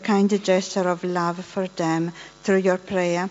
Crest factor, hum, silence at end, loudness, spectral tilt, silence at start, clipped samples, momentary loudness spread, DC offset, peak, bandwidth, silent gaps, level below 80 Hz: 16 dB; none; 0 s; -23 LUFS; -5 dB/octave; 0 s; under 0.1%; 9 LU; under 0.1%; -6 dBFS; 8 kHz; none; -64 dBFS